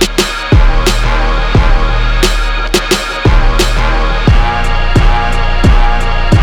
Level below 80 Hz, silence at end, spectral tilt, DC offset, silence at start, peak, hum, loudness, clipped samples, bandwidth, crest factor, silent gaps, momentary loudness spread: -10 dBFS; 0 s; -4.5 dB/octave; under 0.1%; 0 s; 0 dBFS; none; -12 LUFS; under 0.1%; 14.5 kHz; 8 dB; none; 3 LU